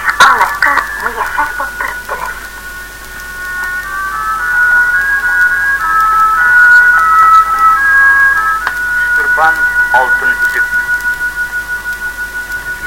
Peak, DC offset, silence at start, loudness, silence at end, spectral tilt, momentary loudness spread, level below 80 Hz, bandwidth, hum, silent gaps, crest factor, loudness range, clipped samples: 0 dBFS; under 0.1%; 0 s; -9 LUFS; 0 s; -1 dB/octave; 14 LU; -36 dBFS; 17 kHz; none; none; 10 dB; 10 LU; 0.3%